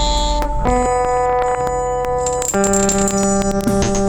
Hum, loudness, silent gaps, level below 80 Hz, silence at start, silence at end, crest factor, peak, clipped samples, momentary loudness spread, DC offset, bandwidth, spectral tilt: none; -17 LUFS; none; -24 dBFS; 0 s; 0 s; 14 dB; -2 dBFS; under 0.1%; 5 LU; under 0.1%; over 20 kHz; -4 dB/octave